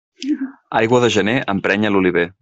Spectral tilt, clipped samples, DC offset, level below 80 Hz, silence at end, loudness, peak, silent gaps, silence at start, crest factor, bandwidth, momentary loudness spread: -5.5 dB/octave; under 0.1%; under 0.1%; -54 dBFS; 0.1 s; -17 LUFS; -2 dBFS; none; 0.2 s; 16 dB; 8.2 kHz; 9 LU